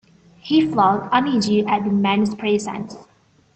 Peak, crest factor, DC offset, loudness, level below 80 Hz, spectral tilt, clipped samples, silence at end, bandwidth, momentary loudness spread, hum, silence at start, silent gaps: -4 dBFS; 16 dB; under 0.1%; -19 LUFS; -58 dBFS; -5.5 dB/octave; under 0.1%; 0.55 s; 8.8 kHz; 13 LU; none; 0.45 s; none